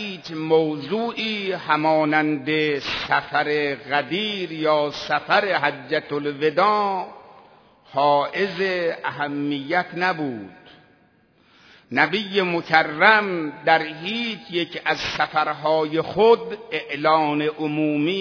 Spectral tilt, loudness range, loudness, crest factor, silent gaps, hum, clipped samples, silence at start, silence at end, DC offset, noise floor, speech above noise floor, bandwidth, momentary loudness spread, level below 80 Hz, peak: -5.5 dB/octave; 4 LU; -21 LUFS; 22 dB; none; none; under 0.1%; 0 s; 0 s; under 0.1%; -58 dBFS; 37 dB; 5.4 kHz; 8 LU; -62 dBFS; 0 dBFS